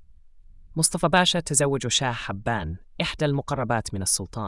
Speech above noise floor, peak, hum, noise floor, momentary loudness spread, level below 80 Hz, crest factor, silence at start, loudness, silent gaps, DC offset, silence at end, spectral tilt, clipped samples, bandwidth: 24 dB; -6 dBFS; none; -48 dBFS; 10 LU; -46 dBFS; 20 dB; 0 s; -24 LUFS; none; under 0.1%; 0 s; -3 dB/octave; under 0.1%; 12 kHz